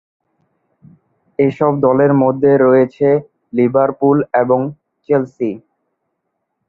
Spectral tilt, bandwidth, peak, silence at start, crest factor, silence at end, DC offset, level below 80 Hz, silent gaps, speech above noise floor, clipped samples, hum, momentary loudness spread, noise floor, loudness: -10.5 dB/octave; 4.2 kHz; 0 dBFS; 1.4 s; 14 dB; 1.1 s; under 0.1%; -58 dBFS; none; 59 dB; under 0.1%; none; 11 LU; -72 dBFS; -14 LUFS